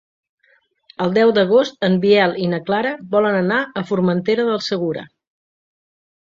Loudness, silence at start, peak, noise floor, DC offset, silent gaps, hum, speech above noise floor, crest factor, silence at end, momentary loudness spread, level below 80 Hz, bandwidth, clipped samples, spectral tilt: -17 LUFS; 1 s; -2 dBFS; -60 dBFS; under 0.1%; none; none; 43 dB; 16 dB; 1.25 s; 8 LU; -62 dBFS; 7.6 kHz; under 0.1%; -6.5 dB/octave